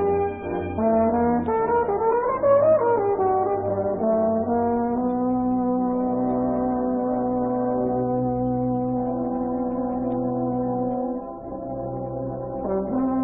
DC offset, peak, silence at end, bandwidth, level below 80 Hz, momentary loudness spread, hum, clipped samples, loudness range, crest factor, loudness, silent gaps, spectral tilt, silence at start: under 0.1%; -8 dBFS; 0 s; 3.4 kHz; -48 dBFS; 9 LU; none; under 0.1%; 6 LU; 14 dB; -23 LUFS; none; -13.5 dB/octave; 0 s